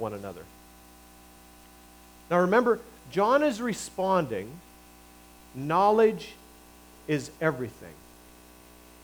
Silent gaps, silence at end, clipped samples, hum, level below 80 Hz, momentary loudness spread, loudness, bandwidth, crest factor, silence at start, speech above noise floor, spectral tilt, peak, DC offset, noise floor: none; 1.1 s; under 0.1%; 60 Hz at -55 dBFS; -60 dBFS; 22 LU; -26 LUFS; over 20 kHz; 20 dB; 0 s; 26 dB; -5.5 dB/octave; -10 dBFS; under 0.1%; -52 dBFS